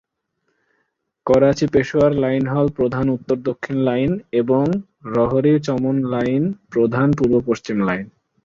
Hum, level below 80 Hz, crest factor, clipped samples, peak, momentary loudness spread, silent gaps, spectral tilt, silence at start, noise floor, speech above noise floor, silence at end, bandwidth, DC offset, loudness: none; -48 dBFS; 16 dB; under 0.1%; -2 dBFS; 7 LU; none; -8 dB/octave; 1.25 s; -72 dBFS; 54 dB; 0.4 s; 7.4 kHz; under 0.1%; -19 LUFS